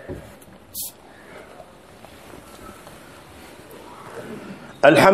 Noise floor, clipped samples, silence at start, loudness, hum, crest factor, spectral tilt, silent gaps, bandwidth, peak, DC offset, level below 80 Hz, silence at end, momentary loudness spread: -45 dBFS; under 0.1%; 0.1 s; -21 LUFS; none; 24 dB; -4.5 dB/octave; none; 15.5 kHz; 0 dBFS; 0.1%; -54 dBFS; 0 s; 22 LU